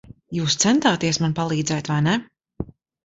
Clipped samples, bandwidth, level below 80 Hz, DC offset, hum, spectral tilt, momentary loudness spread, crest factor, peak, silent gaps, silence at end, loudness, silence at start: under 0.1%; 8.2 kHz; -52 dBFS; under 0.1%; none; -4 dB/octave; 18 LU; 18 dB; -6 dBFS; none; 0.4 s; -21 LUFS; 0.1 s